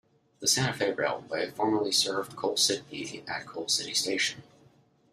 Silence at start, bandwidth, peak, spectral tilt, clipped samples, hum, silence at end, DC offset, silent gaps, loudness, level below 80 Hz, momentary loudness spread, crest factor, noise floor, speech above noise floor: 0.4 s; 15.5 kHz; -10 dBFS; -2 dB/octave; under 0.1%; none; 0.7 s; under 0.1%; none; -28 LUFS; -70 dBFS; 11 LU; 20 dB; -62 dBFS; 33 dB